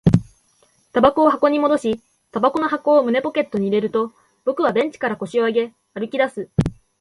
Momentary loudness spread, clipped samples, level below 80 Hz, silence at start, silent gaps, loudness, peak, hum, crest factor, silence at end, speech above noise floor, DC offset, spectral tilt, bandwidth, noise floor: 11 LU; under 0.1%; -44 dBFS; 0.05 s; none; -20 LUFS; 0 dBFS; none; 18 dB; 0.3 s; 41 dB; under 0.1%; -7.5 dB/octave; 11.5 kHz; -60 dBFS